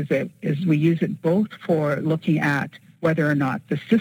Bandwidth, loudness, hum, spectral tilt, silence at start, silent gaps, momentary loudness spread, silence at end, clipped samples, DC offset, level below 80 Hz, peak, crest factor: 14 kHz; -22 LUFS; none; -8 dB/octave; 0 s; none; 6 LU; 0 s; under 0.1%; under 0.1%; -66 dBFS; -6 dBFS; 16 dB